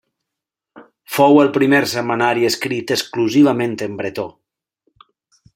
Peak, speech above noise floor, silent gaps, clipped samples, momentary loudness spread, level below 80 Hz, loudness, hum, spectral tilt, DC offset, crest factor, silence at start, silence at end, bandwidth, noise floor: -2 dBFS; 68 dB; none; under 0.1%; 13 LU; -62 dBFS; -16 LUFS; none; -5 dB/octave; under 0.1%; 16 dB; 0.75 s; 1.25 s; 16.5 kHz; -83 dBFS